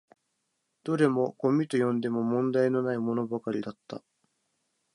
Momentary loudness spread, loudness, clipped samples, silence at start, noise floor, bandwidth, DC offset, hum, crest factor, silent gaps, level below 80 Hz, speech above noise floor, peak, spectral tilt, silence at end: 15 LU; -28 LUFS; under 0.1%; 0.85 s; -79 dBFS; 11 kHz; under 0.1%; none; 18 dB; none; -76 dBFS; 51 dB; -10 dBFS; -7.5 dB/octave; 0.95 s